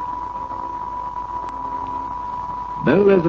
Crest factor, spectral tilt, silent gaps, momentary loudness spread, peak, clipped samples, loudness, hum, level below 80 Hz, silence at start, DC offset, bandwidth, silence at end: 18 dB; -8.5 dB/octave; none; 11 LU; -4 dBFS; under 0.1%; -24 LUFS; none; -44 dBFS; 0 s; under 0.1%; 7 kHz; 0 s